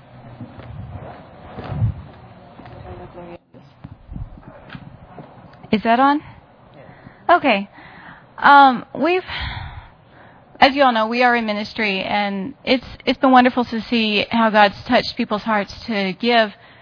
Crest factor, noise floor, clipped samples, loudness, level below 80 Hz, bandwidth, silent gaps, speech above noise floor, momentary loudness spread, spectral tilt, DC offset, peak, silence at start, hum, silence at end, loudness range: 20 dB; -46 dBFS; under 0.1%; -17 LUFS; -44 dBFS; 5.4 kHz; none; 30 dB; 24 LU; -6.5 dB/octave; under 0.1%; 0 dBFS; 0.15 s; none; 0.3 s; 15 LU